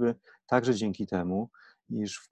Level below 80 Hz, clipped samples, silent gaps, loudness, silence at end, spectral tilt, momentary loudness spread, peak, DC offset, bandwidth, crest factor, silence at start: -60 dBFS; under 0.1%; none; -30 LUFS; 0.1 s; -6 dB/octave; 12 LU; -10 dBFS; under 0.1%; 9.8 kHz; 20 dB; 0 s